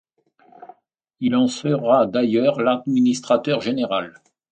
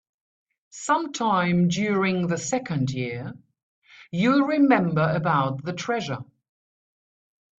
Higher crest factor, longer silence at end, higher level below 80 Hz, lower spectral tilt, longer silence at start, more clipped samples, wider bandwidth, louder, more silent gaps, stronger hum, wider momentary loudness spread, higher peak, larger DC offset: about the same, 18 dB vs 20 dB; second, 0.4 s vs 1.35 s; about the same, -66 dBFS vs -62 dBFS; about the same, -6 dB/octave vs -6 dB/octave; second, 0.6 s vs 0.75 s; neither; about the same, 9 kHz vs 8.4 kHz; first, -20 LUFS vs -23 LUFS; second, none vs 3.63-3.82 s; neither; second, 7 LU vs 13 LU; about the same, -4 dBFS vs -6 dBFS; neither